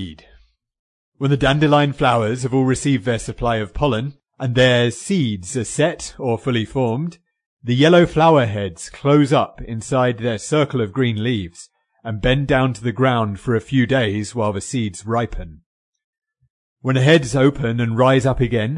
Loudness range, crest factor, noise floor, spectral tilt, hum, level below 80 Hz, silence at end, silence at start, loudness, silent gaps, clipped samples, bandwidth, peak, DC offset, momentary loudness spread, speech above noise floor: 4 LU; 16 dB; -53 dBFS; -6 dB/octave; none; -40 dBFS; 0 s; 0 s; -18 LUFS; 0.79-1.12 s, 7.46-7.57 s, 15.66-15.93 s, 16.04-16.13 s, 16.50-16.76 s; under 0.1%; 11 kHz; -2 dBFS; under 0.1%; 12 LU; 35 dB